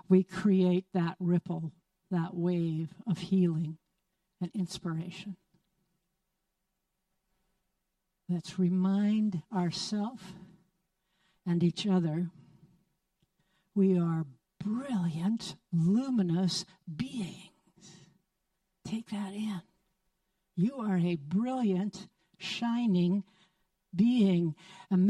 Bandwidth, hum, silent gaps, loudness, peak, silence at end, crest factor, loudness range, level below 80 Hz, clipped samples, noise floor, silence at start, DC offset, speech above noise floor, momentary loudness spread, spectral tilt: 11 kHz; none; none; -31 LUFS; -12 dBFS; 0 s; 20 dB; 11 LU; -72 dBFS; under 0.1%; -83 dBFS; 0.1 s; under 0.1%; 53 dB; 15 LU; -7 dB/octave